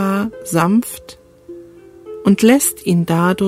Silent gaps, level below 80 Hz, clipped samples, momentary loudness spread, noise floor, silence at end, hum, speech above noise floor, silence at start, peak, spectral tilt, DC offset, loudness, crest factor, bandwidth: none; -52 dBFS; under 0.1%; 20 LU; -39 dBFS; 0 s; none; 25 dB; 0 s; 0 dBFS; -5.5 dB/octave; under 0.1%; -15 LUFS; 16 dB; 16 kHz